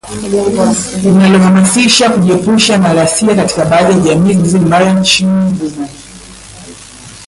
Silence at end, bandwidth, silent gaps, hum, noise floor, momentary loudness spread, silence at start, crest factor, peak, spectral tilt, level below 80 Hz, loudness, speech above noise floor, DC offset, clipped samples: 0 s; 11.5 kHz; none; none; -32 dBFS; 8 LU; 0.05 s; 10 dB; 0 dBFS; -4.5 dB/octave; -40 dBFS; -9 LUFS; 23 dB; under 0.1%; under 0.1%